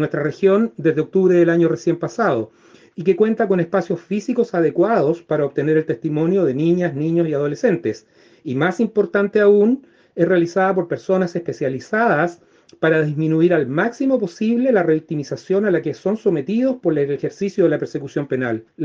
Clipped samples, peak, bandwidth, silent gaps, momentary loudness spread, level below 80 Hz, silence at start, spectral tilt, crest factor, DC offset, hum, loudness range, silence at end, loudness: under 0.1%; -4 dBFS; 7.4 kHz; none; 8 LU; -62 dBFS; 0 s; -8 dB/octave; 14 dB; under 0.1%; none; 2 LU; 0 s; -19 LUFS